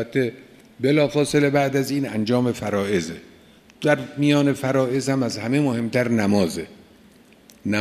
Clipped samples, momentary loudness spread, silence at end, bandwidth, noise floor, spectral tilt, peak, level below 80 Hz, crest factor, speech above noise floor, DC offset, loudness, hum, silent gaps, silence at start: under 0.1%; 7 LU; 0 s; 14.5 kHz; -51 dBFS; -6 dB/octave; -2 dBFS; -58 dBFS; 20 dB; 30 dB; under 0.1%; -21 LUFS; none; none; 0 s